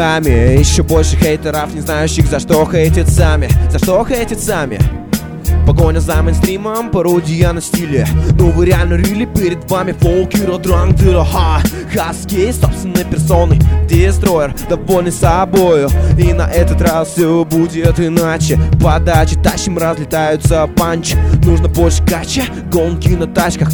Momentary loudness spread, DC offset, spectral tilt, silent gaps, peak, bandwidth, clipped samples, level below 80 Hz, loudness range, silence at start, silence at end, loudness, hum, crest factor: 6 LU; under 0.1%; -6 dB/octave; none; 0 dBFS; over 20 kHz; 0.5%; -16 dBFS; 2 LU; 0 s; 0 s; -12 LUFS; none; 10 dB